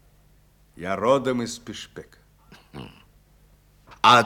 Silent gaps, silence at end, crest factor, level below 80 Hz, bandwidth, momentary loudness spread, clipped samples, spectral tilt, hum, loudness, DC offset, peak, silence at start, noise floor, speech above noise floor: none; 0 s; 24 dB; -58 dBFS; 18 kHz; 24 LU; under 0.1%; -4 dB/octave; 50 Hz at -60 dBFS; -24 LUFS; under 0.1%; -2 dBFS; 0.8 s; -57 dBFS; 32 dB